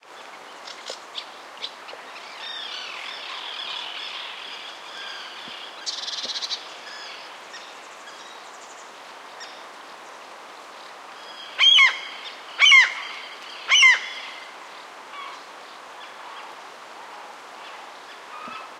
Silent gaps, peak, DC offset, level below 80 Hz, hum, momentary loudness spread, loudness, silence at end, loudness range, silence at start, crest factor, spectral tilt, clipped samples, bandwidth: none; -4 dBFS; under 0.1%; -88 dBFS; none; 26 LU; -19 LUFS; 0 s; 22 LU; 0.05 s; 22 dB; 3 dB/octave; under 0.1%; 15 kHz